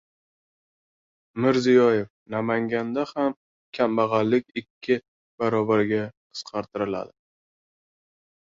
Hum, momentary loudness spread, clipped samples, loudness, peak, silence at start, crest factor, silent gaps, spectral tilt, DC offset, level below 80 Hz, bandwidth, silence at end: none; 16 LU; under 0.1%; -24 LUFS; -6 dBFS; 1.35 s; 18 dB; 2.10-2.26 s, 3.37-3.72 s, 4.70-4.81 s, 5.08-5.38 s, 6.17-6.30 s; -6.5 dB/octave; under 0.1%; -66 dBFS; 7.6 kHz; 1.4 s